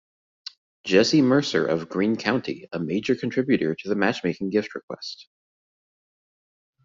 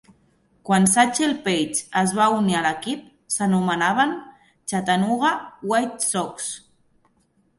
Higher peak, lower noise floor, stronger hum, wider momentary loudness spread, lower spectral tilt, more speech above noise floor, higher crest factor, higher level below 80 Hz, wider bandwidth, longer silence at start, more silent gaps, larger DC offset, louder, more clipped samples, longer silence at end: about the same, -4 dBFS vs -4 dBFS; first, under -90 dBFS vs -64 dBFS; neither; first, 18 LU vs 13 LU; about the same, -4.5 dB/octave vs -4 dB/octave; first, over 67 dB vs 43 dB; about the same, 22 dB vs 20 dB; about the same, -64 dBFS vs -62 dBFS; second, 7.6 kHz vs 12 kHz; first, 0.85 s vs 0.65 s; first, 4.83-4.88 s vs none; neither; about the same, -23 LUFS vs -21 LUFS; neither; first, 1.6 s vs 1 s